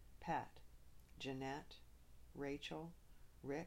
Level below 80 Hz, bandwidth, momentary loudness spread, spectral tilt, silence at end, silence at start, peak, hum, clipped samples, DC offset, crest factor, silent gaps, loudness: -66 dBFS; 16 kHz; 23 LU; -5.5 dB/octave; 0 s; 0 s; -32 dBFS; none; under 0.1%; under 0.1%; 18 dB; none; -49 LUFS